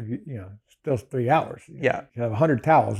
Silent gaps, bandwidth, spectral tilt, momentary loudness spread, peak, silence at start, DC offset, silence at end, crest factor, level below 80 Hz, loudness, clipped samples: none; 13 kHz; -8 dB/octave; 16 LU; -8 dBFS; 0 s; under 0.1%; 0 s; 16 dB; -62 dBFS; -24 LUFS; under 0.1%